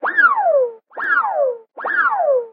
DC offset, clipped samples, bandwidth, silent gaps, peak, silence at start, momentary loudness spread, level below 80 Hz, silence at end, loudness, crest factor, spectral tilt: under 0.1%; under 0.1%; 5.2 kHz; none; -2 dBFS; 0 s; 10 LU; -82 dBFS; 0 s; -17 LUFS; 14 dB; -5 dB/octave